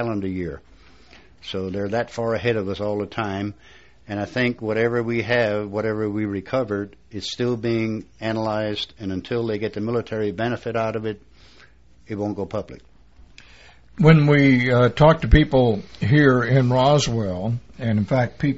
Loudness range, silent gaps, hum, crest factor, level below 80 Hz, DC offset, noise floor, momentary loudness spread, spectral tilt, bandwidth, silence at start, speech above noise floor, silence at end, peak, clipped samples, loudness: 10 LU; none; none; 22 dB; -36 dBFS; 0.2%; -52 dBFS; 14 LU; -6 dB/octave; 8 kHz; 0 s; 31 dB; 0 s; 0 dBFS; under 0.1%; -21 LUFS